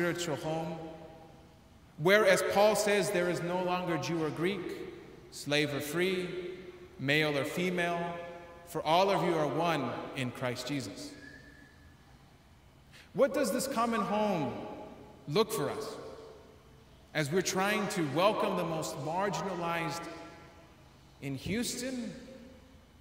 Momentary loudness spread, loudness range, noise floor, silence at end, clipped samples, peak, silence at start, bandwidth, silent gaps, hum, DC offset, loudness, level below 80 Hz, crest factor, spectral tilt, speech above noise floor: 20 LU; 7 LU; -59 dBFS; 0.25 s; under 0.1%; -12 dBFS; 0 s; 16 kHz; none; none; under 0.1%; -32 LUFS; -64 dBFS; 22 dB; -4.5 dB/octave; 28 dB